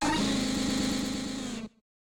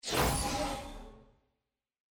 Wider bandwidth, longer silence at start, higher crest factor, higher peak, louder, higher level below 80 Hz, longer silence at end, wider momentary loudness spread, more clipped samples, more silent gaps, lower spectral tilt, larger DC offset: second, 17.5 kHz vs 19.5 kHz; about the same, 0 s vs 0.05 s; second, 14 dB vs 20 dB; about the same, -16 dBFS vs -16 dBFS; first, -30 LUFS vs -33 LUFS; about the same, -48 dBFS vs -44 dBFS; second, 0.45 s vs 0.9 s; second, 11 LU vs 18 LU; neither; neither; about the same, -3.5 dB/octave vs -3.5 dB/octave; neither